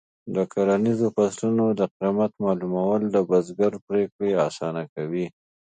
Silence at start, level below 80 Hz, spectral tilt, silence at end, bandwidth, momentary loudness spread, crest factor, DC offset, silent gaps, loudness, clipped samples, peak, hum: 0.25 s; -64 dBFS; -7.5 dB/octave; 0.4 s; 9.4 kHz; 8 LU; 16 dB; under 0.1%; 1.91-2.00 s, 3.82-3.87 s, 4.12-4.19 s, 4.89-4.96 s; -24 LUFS; under 0.1%; -8 dBFS; none